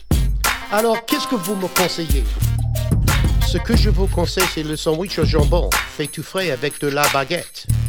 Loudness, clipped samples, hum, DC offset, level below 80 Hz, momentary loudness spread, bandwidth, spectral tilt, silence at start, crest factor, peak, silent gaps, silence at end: -19 LUFS; under 0.1%; none; under 0.1%; -22 dBFS; 5 LU; over 20 kHz; -4.5 dB/octave; 0 s; 16 dB; -2 dBFS; none; 0 s